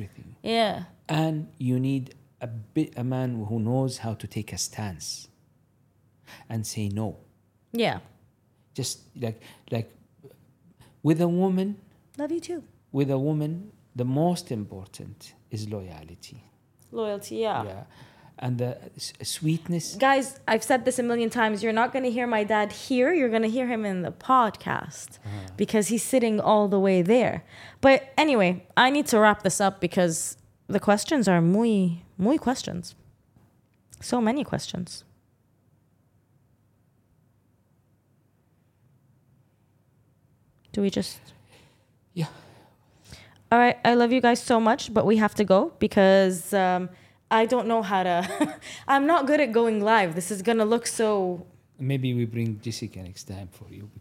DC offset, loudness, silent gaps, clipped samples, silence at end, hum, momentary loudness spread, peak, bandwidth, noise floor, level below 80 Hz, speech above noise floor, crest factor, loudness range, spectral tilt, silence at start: under 0.1%; -25 LUFS; none; under 0.1%; 0 s; none; 17 LU; -6 dBFS; 16.5 kHz; -65 dBFS; -62 dBFS; 41 dB; 20 dB; 12 LU; -5 dB/octave; 0 s